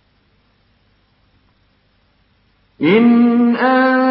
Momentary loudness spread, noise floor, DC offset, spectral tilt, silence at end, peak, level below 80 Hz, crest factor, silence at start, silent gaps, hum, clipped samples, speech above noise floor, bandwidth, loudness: 4 LU; -58 dBFS; under 0.1%; -11.5 dB/octave; 0 s; -2 dBFS; -62 dBFS; 14 dB; 2.8 s; none; 50 Hz at -50 dBFS; under 0.1%; 47 dB; 5.2 kHz; -12 LUFS